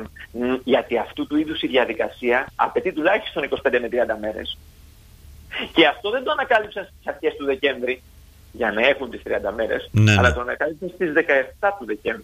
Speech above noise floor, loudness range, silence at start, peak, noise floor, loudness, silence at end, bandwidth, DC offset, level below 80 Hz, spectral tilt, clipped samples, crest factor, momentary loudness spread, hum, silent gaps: 25 dB; 3 LU; 0 s; -2 dBFS; -47 dBFS; -21 LUFS; 0 s; 15 kHz; under 0.1%; -44 dBFS; -6 dB/octave; under 0.1%; 20 dB; 11 LU; none; none